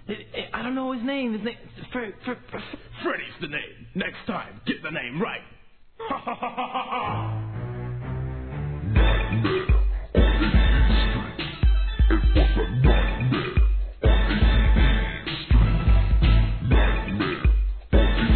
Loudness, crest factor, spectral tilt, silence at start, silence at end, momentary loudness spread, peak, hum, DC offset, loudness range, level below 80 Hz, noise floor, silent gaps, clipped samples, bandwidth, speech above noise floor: -24 LUFS; 16 dB; -10 dB/octave; 0.05 s; 0 s; 12 LU; -6 dBFS; none; 0.2%; 9 LU; -24 dBFS; -43 dBFS; none; under 0.1%; 4.5 kHz; 15 dB